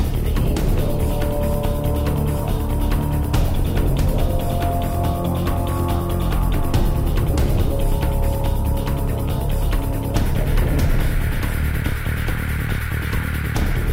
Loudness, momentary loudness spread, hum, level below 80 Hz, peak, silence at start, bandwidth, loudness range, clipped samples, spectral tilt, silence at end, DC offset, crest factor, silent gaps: -22 LUFS; 3 LU; none; -22 dBFS; -6 dBFS; 0 s; 16.5 kHz; 1 LU; under 0.1%; -6.5 dB/octave; 0 s; under 0.1%; 12 dB; none